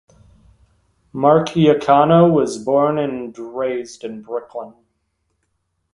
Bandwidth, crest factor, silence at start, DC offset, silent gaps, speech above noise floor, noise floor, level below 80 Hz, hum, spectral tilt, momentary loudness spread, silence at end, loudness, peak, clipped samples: 11.5 kHz; 18 dB; 1.15 s; under 0.1%; none; 54 dB; -70 dBFS; -54 dBFS; none; -7 dB/octave; 19 LU; 1.25 s; -16 LUFS; 0 dBFS; under 0.1%